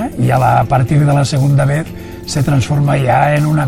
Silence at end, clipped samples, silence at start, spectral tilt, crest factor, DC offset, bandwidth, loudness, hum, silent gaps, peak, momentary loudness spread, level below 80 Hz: 0 s; under 0.1%; 0 s; -7 dB/octave; 12 dB; under 0.1%; 15 kHz; -13 LUFS; none; none; 0 dBFS; 7 LU; -34 dBFS